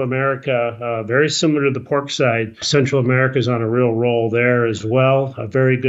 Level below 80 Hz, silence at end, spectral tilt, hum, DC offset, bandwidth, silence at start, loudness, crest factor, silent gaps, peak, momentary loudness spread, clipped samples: -58 dBFS; 0 s; -5.5 dB/octave; none; under 0.1%; 8 kHz; 0 s; -17 LUFS; 14 dB; none; -2 dBFS; 5 LU; under 0.1%